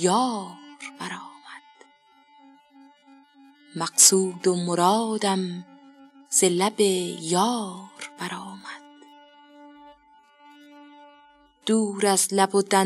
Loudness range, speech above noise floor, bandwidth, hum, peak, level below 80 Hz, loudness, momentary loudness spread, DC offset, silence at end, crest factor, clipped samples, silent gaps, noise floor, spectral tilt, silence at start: 19 LU; 35 dB; 14.5 kHz; none; -4 dBFS; -80 dBFS; -22 LUFS; 21 LU; under 0.1%; 0 s; 22 dB; under 0.1%; none; -58 dBFS; -3 dB/octave; 0 s